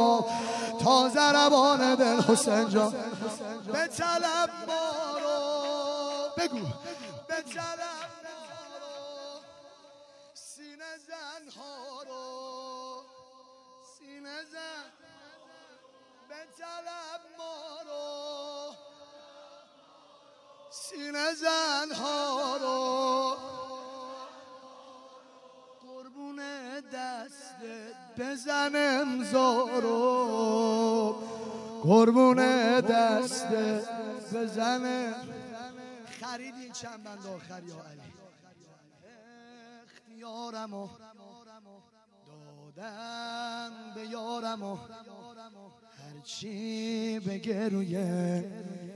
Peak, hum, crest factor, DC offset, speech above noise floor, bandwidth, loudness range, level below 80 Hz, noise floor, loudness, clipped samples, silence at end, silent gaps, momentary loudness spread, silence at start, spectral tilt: -8 dBFS; none; 22 dB; under 0.1%; 33 dB; 12 kHz; 21 LU; -80 dBFS; -62 dBFS; -29 LUFS; under 0.1%; 0 s; none; 22 LU; 0 s; -4 dB/octave